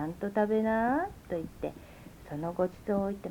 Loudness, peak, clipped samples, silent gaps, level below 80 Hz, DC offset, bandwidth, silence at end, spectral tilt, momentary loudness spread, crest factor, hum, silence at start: -32 LUFS; -16 dBFS; under 0.1%; none; -56 dBFS; under 0.1%; 19.5 kHz; 0 s; -8 dB/octave; 16 LU; 16 dB; none; 0 s